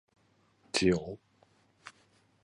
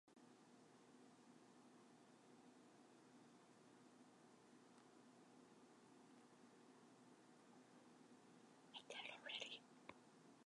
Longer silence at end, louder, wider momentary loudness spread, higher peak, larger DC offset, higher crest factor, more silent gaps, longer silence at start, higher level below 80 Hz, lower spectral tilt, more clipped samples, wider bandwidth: first, 0.55 s vs 0.05 s; first, -30 LUFS vs -63 LUFS; first, 25 LU vs 15 LU; first, -10 dBFS vs -36 dBFS; neither; about the same, 26 dB vs 28 dB; neither; first, 0.75 s vs 0.05 s; first, -58 dBFS vs under -90 dBFS; first, -4.5 dB/octave vs -2.5 dB/octave; neither; about the same, 11 kHz vs 11 kHz